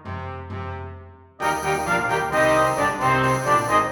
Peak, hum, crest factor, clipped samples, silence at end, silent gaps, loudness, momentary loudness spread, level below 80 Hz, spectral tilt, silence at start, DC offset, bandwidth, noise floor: -6 dBFS; none; 16 dB; under 0.1%; 0 s; none; -20 LUFS; 14 LU; -46 dBFS; -4.5 dB/octave; 0 s; under 0.1%; 19 kHz; -42 dBFS